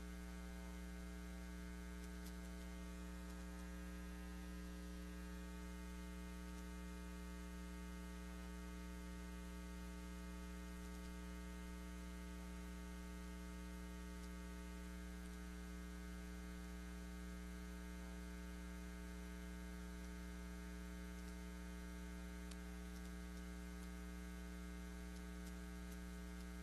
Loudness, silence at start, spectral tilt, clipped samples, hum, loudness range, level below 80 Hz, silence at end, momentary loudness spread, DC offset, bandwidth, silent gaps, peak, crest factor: -53 LUFS; 0 s; -5.5 dB/octave; under 0.1%; none; 0 LU; -54 dBFS; 0 s; 0 LU; under 0.1%; 12.5 kHz; none; -36 dBFS; 16 dB